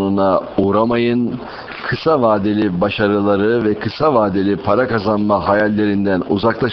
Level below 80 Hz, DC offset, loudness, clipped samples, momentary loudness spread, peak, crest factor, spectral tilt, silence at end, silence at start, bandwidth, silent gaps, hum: -46 dBFS; 0.1%; -16 LUFS; under 0.1%; 5 LU; 0 dBFS; 16 dB; -9 dB/octave; 0 s; 0 s; 6 kHz; none; none